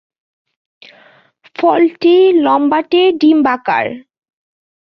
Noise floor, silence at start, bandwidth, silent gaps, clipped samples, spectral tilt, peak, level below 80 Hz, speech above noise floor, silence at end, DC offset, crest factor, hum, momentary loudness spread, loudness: -48 dBFS; 1.6 s; 5.8 kHz; none; under 0.1%; -6.5 dB/octave; -2 dBFS; -62 dBFS; 37 dB; 0.85 s; under 0.1%; 12 dB; none; 9 LU; -12 LUFS